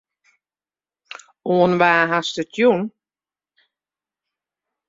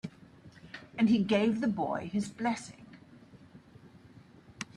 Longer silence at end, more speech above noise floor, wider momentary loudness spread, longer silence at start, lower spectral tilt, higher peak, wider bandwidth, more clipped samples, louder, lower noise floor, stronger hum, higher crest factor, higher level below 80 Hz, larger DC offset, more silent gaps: first, 2 s vs 0.1 s; first, over 73 dB vs 26 dB; about the same, 24 LU vs 22 LU; first, 1.45 s vs 0.05 s; about the same, -5.5 dB/octave vs -6 dB/octave; first, -2 dBFS vs -16 dBFS; second, 7.8 kHz vs 11 kHz; neither; first, -18 LUFS vs -30 LUFS; first, under -90 dBFS vs -56 dBFS; neither; about the same, 20 dB vs 18 dB; about the same, -64 dBFS vs -68 dBFS; neither; neither